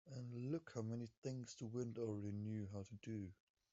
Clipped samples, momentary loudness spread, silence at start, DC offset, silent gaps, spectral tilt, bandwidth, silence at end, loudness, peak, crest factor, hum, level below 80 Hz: under 0.1%; 6 LU; 0.05 s; under 0.1%; 1.17-1.22 s; -8.5 dB/octave; 7.8 kHz; 0.4 s; -49 LUFS; -32 dBFS; 16 dB; none; -82 dBFS